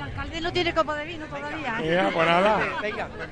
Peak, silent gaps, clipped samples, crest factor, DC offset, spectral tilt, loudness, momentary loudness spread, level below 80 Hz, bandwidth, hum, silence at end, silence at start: -6 dBFS; none; under 0.1%; 18 dB; 0.2%; -5.5 dB/octave; -25 LUFS; 12 LU; -44 dBFS; 10 kHz; none; 0 s; 0 s